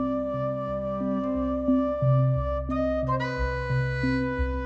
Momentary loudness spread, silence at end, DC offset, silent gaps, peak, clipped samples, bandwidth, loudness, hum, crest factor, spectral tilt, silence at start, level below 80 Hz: 6 LU; 0 s; under 0.1%; none; -14 dBFS; under 0.1%; 6.8 kHz; -27 LUFS; none; 12 dB; -9 dB/octave; 0 s; -36 dBFS